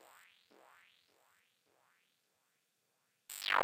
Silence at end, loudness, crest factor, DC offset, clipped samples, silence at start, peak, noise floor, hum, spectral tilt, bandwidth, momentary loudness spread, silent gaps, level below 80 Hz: 0 s; -39 LUFS; 30 dB; under 0.1%; under 0.1%; 3.3 s; -16 dBFS; -81 dBFS; none; 0 dB/octave; 17 kHz; 26 LU; none; -88 dBFS